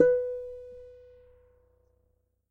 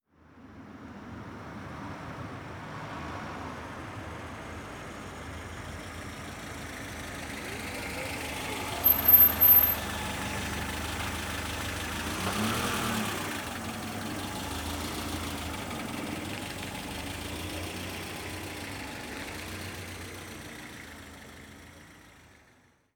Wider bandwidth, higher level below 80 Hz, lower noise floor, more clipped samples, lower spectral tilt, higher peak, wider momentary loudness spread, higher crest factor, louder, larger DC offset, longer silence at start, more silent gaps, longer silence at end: second, 2.6 kHz vs over 20 kHz; second, -62 dBFS vs -48 dBFS; first, -73 dBFS vs -63 dBFS; neither; first, -8 dB/octave vs -3.5 dB/octave; about the same, -8 dBFS vs -8 dBFS; first, 25 LU vs 17 LU; about the same, 24 dB vs 24 dB; about the same, -30 LUFS vs -28 LUFS; neither; second, 0 s vs 0.3 s; neither; first, 1.6 s vs 0.6 s